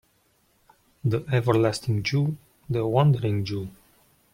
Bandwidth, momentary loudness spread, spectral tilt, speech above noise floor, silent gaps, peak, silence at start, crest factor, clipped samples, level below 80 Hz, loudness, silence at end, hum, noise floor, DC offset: 16 kHz; 11 LU; -7 dB/octave; 42 dB; none; -6 dBFS; 1.05 s; 20 dB; under 0.1%; -56 dBFS; -25 LUFS; 0.65 s; none; -66 dBFS; under 0.1%